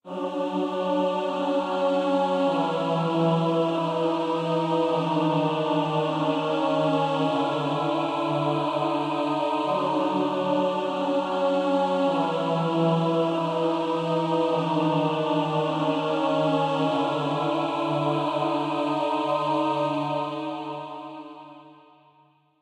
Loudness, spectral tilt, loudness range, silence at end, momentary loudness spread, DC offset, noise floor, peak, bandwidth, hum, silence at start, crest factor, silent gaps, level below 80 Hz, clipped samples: -25 LUFS; -7 dB/octave; 2 LU; 0.9 s; 3 LU; under 0.1%; -61 dBFS; -12 dBFS; 10.5 kHz; none; 0.05 s; 14 dB; none; -76 dBFS; under 0.1%